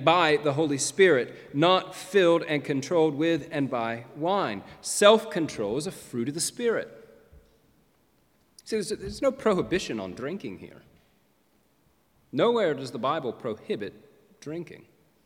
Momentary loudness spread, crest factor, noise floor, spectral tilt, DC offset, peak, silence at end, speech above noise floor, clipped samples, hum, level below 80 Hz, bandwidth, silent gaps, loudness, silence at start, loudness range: 15 LU; 24 dB; -67 dBFS; -4 dB/octave; under 0.1%; -4 dBFS; 0.5 s; 41 dB; under 0.1%; none; -62 dBFS; 16.5 kHz; none; -26 LUFS; 0 s; 8 LU